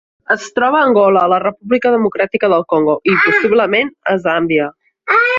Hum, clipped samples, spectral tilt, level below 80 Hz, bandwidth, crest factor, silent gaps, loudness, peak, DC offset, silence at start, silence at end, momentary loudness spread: none; under 0.1%; -5.5 dB/octave; -58 dBFS; 7.6 kHz; 12 dB; none; -13 LUFS; -2 dBFS; under 0.1%; 0.3 s; 0 s; 6 LU